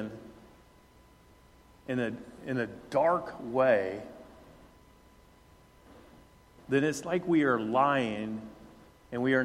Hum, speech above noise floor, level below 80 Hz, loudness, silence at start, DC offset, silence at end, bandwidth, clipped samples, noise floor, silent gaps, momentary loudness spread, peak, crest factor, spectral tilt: none; 30 dB; -64 dBFS; -30 LUFS; 0 s; under 0.1%; 0 s; 15 kHz; under 0.1%; -59 dBFS; none; 20 LU; -12 dBFS; 20 dB; -6 dB/octave